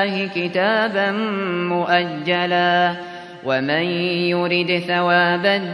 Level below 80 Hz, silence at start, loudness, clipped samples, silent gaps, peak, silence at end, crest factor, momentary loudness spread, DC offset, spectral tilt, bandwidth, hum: -68 dBFS; 0 s; -19 LUFS; under 0.1%; none; -4 dBFS; 0 s; 16 dB; 6 LU; under 0.1%; -6.5 dB/octave; 11 kHz; none